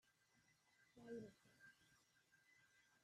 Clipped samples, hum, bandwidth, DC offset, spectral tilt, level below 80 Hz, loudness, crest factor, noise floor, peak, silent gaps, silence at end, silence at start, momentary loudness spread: under 0.1%; none; 13 kHz; under 0.1%; -5.5 dB/octave; under -90 dBFS; -61 LUFS; 20 dB; -80 dBFS; -44 dBFS; none; 0 s; 0.05 s; 12 LU